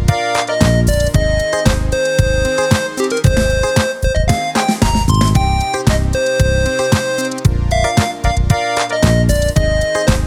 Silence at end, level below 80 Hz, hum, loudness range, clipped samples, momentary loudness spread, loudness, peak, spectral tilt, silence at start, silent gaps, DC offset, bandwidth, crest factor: 0 s; -20 dBFS; none; 1 LU; under 0.1%; 3 LU; -15 LUFS; 0 dBFS; -5 dB/octave; 0 s; none; under 0.1%; 17.5 kHz; 14 dB